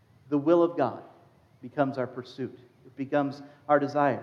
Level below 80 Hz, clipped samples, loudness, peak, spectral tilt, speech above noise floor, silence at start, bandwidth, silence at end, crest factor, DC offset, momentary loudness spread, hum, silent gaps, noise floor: -80 dBFS; under 0.1%; -28 LUFS; -10 dBFS; -8 dB/octave; 31 dB; 0.3 s; 6.8 kHz; 0 s; 20 dB; under 0.1%; 16 LU; none; none; -58 dBFS